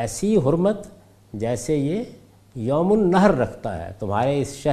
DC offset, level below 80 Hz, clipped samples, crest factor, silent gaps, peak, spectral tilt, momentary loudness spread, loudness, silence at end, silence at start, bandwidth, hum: under 0.1%; -46 dBFS; under 0.1%; 20 dB; none; -2 dBFS; -6.5 dB/octave; 13 LU; -22 LUFS; 0 s; 0 s; 14.5 kHz; none